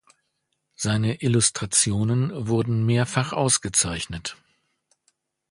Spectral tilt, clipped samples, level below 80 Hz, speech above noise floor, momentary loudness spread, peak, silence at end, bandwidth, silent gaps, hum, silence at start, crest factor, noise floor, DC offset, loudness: -4 dB/octave; under 0.1%; -50 dBFS; 53 dB; 10 LU; -4 dBFS; 1.15 s; 11.5 kHz; none; none; 0.8 s; 20 dB; -76 dBFS; under 0.1%; -22 LUFS